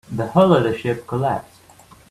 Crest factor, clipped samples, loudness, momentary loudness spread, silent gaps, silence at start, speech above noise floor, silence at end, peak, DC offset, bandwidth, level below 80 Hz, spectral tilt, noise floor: 18 dB; under 0.1%; -19 LUFS; 10 LU; none; 0.1 s; 30 dB; 0.7 s; -2 dBFS; under 0.1%; 13.5 kHz; -52 dBFS; -7.5 dB/octave; -48 dBFS